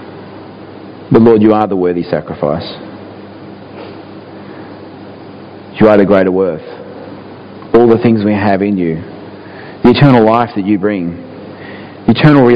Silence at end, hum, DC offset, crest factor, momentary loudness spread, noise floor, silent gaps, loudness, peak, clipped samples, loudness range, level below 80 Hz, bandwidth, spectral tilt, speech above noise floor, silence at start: 0 s; none; under 0.1%; 12 dB; 24 LU; -31 dBFS; none; -10 LUFS; 0 dBFS; 0.8%; 10 LU; -42 dBFS; 5.2 kHz; -9.5 dB/octave; 22 dB; 0 s